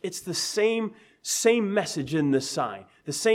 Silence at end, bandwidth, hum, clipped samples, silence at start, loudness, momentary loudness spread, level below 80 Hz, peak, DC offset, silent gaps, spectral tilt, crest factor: 0 s; 16.5 kHz; none; under 0.1%; 0.05 s; -26 LUFS; 12 LU; -68 dBFS; -8 dBFS; under 0.1%; none; -3.5 dB/octave; 18 dB